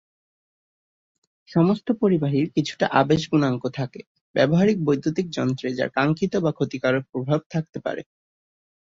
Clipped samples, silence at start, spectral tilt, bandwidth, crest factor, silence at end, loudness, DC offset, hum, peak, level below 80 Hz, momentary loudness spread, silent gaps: under 0.1%; 1.5 s; -7 dB/octave; 7.6 kHz; 20 dB; 0.9 s; -23 LUFS; under 0.1%; none; -4 dBFS; -58 dBFS; 10 LU; 4.07-4.15 s, 4.21-4.34 s, 7.46-7.50 s, 7.69-7.73 s